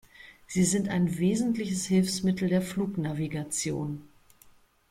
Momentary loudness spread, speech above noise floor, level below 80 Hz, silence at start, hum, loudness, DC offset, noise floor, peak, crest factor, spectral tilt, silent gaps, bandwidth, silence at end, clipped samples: 8 LU; 31 dB; -58 dBFS; 0.2 s; none; -28 LUFS; under 0.1%; -59 dBFS; -14 dBFS; 16 dB; -5.5 dB/octave; none; 15.5 kHz; 0.85 s; under 0.1%